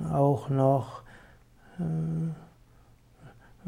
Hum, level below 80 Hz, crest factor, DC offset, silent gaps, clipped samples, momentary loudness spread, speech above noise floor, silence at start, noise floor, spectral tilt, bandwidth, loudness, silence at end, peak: none; -58 dBFS; 18 dB; under 0.1%; none; under 0.1%; 20 LU; 31 dB; 0 s; -58 dBFS; -9.5 dB/octave; 10.5 kHz; -28 LUFS; 0 s; -12 dBFS